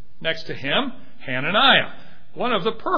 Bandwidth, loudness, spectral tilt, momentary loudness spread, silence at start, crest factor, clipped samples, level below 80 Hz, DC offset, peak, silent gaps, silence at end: 5.4 kHz; -20 LUFS; -5.5 dB/octave; 16 LU; 0.2 s; 20 dB; under 0.1%; -54 dBFS; 4%; -2 dBFS; none; 0 s